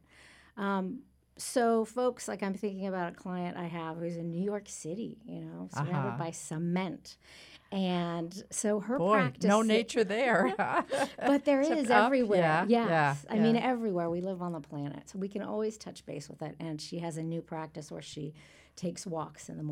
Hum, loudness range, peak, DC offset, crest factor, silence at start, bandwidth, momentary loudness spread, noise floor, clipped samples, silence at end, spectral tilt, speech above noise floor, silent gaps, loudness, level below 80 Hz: none; 11 LU; -10 dBFS; under 0.1%; 22 dB; 0.55 s; 15.5 kHz; 16 LU; -58 dBFS; under 0.1%; 0 s; -5.5 dB/octave; 27 dB; none; -31 LUFS; -68 dBFS